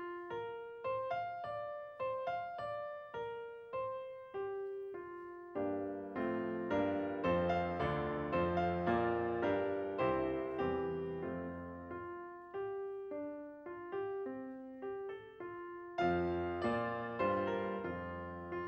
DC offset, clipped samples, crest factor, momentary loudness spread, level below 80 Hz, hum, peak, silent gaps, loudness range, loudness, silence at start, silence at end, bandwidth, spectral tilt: under 0.1%; under 0.1%; 18 dB; 12 LU; -64 dBFS; none; -22 dBFS; none; 9 LU; -39 LUFS; 0 s; 0 s; 7.6 kHz; -8.5 dB/octave